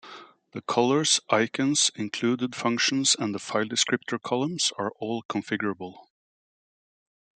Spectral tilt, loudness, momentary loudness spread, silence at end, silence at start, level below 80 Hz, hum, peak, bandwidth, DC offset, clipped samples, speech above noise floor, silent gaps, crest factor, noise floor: -2.5 dB/octave; -25 LUFS; 10 LU; 1.4 s; 0.05 s; -74 dBFS; none; -6 dBFS; 9.6 kHz; under 0.1%; under 0.1%; 21 dB; 5.25-5.29 s; 22 dB; -47 dBFS